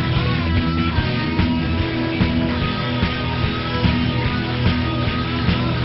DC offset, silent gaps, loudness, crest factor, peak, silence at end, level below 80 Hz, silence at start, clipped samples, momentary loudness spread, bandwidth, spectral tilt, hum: under 0.1%; none; -20 LUFS; 16 dB; -4 dBFS; 0 s; -30 dBFS; 0 s; under 0.1%; 2 LU; 6 kHz; -5 dB/octave; none